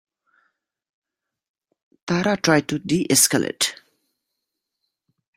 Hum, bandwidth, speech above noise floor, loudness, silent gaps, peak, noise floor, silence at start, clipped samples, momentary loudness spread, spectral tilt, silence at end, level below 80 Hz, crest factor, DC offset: none; 16 kHz; 61 dB; -19 LUFS; none; -2 dBFS; -81 dBFS; 2.05 s; under 0.1%; 8 LU; -3 dB/octave; 1.65 s; -62 dBFS; 22 dB; under 0.1%